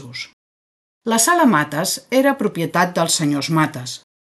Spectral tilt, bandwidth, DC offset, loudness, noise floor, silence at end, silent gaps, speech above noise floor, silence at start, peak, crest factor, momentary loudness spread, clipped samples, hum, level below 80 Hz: -3.5 dB/octave; 12.5 kHz; under 0.1%; -17 LUFS; under -90 dBFS; 0.25 s; 0.33-1.01 s; over 72 dB; 0 s; -2 dBFS; 16 dB; 16 LU; under 0.1%; none; -64 dBFS